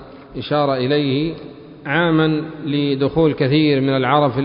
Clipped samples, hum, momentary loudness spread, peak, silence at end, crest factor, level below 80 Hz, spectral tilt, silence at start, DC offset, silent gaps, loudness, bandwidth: under 0.1%; none; 15 LU; -2 dBFS; 0 s; 16 dB; -48 dBFS; -12 dB/octave; 0 s; under 0.1%; none; -18 LUFS; 5.4 kHz